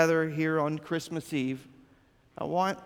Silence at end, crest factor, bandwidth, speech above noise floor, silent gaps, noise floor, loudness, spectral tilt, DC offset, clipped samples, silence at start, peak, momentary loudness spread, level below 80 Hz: 0 s; 22 dB; 17.5 kHz; 33 dB; none; -62 dBFS; -31 LUFS; -6 dB/octave; under 0.1%; under 0.1%; 0 s; -8 dBFS; 8 LU; -68 dBFS